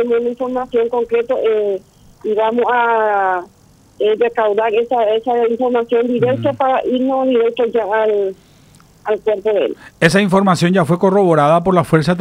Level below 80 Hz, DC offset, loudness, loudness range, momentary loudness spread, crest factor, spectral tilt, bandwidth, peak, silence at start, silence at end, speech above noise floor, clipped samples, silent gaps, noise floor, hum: -52 dBFS; under 0.1%; -15 LUFS; 3 LU; 7 LU; 14 dB; -6.5 dB/octave; 14.5 kHz; 0 dBFS; 0 s; 0 s; 32 dB; under 0.1%; none; -46 dBFS; none